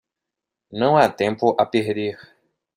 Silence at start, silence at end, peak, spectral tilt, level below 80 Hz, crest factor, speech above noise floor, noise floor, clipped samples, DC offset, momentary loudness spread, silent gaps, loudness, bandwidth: 0.7 s; 0.6 s; -2 dBFS; -6.5 dB/octave; -64 dBFS; 20 dB; 65 dB; -85 dBFS; under 0.1%; under 0.1%; 11 LU; none; -20 LUFS; 15.5 kHz